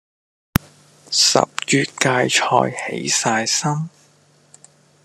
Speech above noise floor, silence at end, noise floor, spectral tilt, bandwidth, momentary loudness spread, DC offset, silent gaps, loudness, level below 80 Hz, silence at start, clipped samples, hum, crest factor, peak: 36 dB; 1.15 s; -55 dBFS; -2.5 dB/octave; 13 kHz; 10 LU; under 0.1%; none; -18 LUFS; -44 dBFS; 1.1 s; under 0.1%; none; 20 dB; 0 dBFS